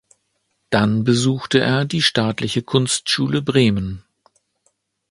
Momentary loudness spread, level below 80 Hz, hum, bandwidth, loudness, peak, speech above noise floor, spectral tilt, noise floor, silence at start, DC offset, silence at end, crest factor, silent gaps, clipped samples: 6 LU; -48 dBFS; none; 11.5 kHz; -18 LUFS; 0 dBFS; 52 dB; -4.5 dB/octave; -70 dBFS; 0.7 s; under 0.1%; 1.1 s; 20 dB; none; under 0.1%